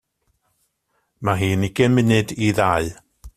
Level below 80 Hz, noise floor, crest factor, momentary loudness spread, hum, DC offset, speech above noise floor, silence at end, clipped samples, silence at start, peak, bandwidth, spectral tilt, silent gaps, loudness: -48 dBFS; -70 dBFS; 18 dB; 7 LU; none; under 0.1%; 52 dB; 0.05 s; under 0.1%; 1.2 s; -2 dBFS; 15 kHz; -6 dB/octave; none; -19 LUFS